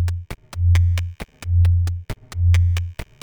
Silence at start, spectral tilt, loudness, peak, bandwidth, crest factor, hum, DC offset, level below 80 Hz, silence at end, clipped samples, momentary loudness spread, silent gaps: 0 s; -6 dB/octave; -20 LUFS; -8 dBFS; 9 kHz; 12 dB; none; under 0.1%; -28 dBFS; 0.2 s; under 0.1%; 15 LU; none